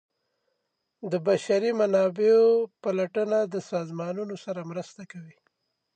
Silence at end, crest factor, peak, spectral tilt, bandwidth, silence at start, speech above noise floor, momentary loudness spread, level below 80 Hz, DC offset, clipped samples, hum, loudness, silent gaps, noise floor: 0.65 s; 16 dB; -12 dBFS; -6 dB/octave; 9 kHz; 1 s; 54 dB; 19 LU; -82 dBFS; under 0.1%; under 0.1%; none; -25 LUFS; none; -79 dBFS